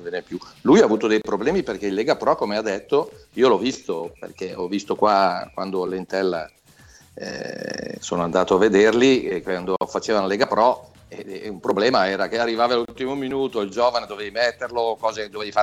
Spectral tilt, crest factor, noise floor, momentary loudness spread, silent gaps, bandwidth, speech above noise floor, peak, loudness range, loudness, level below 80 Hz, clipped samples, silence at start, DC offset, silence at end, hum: -5 dB/octave; 18 dB; -50 dBFS; 14 LU; none; 12.5 kHz; 29 dB; -4 dBFS; 5 LU; -21 LUFS; -56 dBFS; under 0.1%; 0 s; under 0.1%; 0 s; none